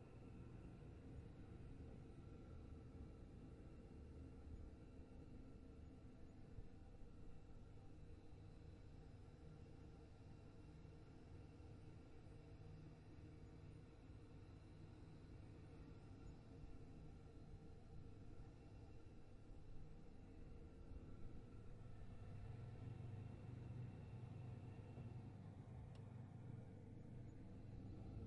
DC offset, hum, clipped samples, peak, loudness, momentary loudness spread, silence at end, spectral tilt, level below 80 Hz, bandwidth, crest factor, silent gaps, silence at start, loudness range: under 0.1%; none; under 0.1%; -42 dBFS; -61 LUFS; 7 LU; 0 s; -8 dB/octave; -64 dBFS; 10 kHz; 14 dB; none; 0 s; 6 LU